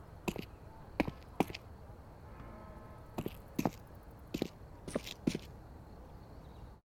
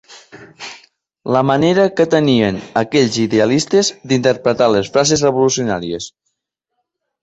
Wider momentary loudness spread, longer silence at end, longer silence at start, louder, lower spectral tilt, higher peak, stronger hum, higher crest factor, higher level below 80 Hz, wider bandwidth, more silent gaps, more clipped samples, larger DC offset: about the same, 16 LU vs 16 LU; second, 0.1 s vs 1.15 s; about the same, 0 s vs 0.1 s; second, -42 LUFS vs -15 LUFS; about the same, -5.5 dB/octave vs -4.5 dB/octave; second, -14 dBFS vs -2 dBFS; neither; first, 30 dB vs 14 dB; second, -56 dBFS vs -50 dBFS; first, 18.5 kHz vs 8.2 kHz; neither; neither; neither